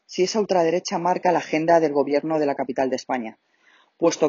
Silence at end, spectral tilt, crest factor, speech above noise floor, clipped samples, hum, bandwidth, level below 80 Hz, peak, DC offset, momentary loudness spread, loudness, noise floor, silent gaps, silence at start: 0 s; -4 dB/octave; 16 dB; 38 dB; under 0.1%; none; 7.6 kHz; -70 dBFS; -6 dBFS; under 0.1%; 7 LU; -22 LUFS; -59 dBFS; none; 0.1 s